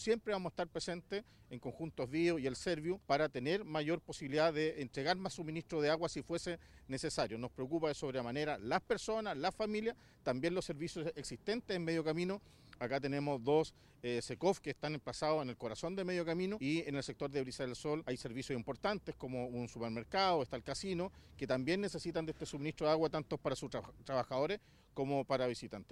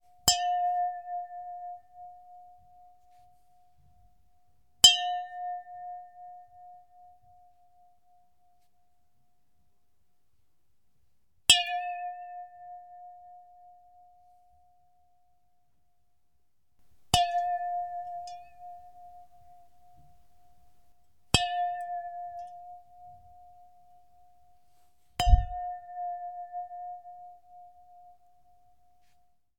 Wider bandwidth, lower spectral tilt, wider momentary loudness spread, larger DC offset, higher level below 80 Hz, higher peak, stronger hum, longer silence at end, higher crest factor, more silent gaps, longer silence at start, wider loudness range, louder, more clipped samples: second, 13 kHz vs 19 kHz; first, -5 dB/octave vs -1.5 dB/octave; second, 9 LU vs 28 LU; second, under 0.1% vs 0.1%; second, -64 dBFS vs -42 dBFS; second, -20 dBFS vs -2 dBFS; neither; second, 0.1 s vs 1.5 s; second, 20 dB vs 34 dB; neither; second, 0 s vs 0.25 s; second, 2 LU vs 20 LU; second, -39 LUFS vs -28 LUFS; neither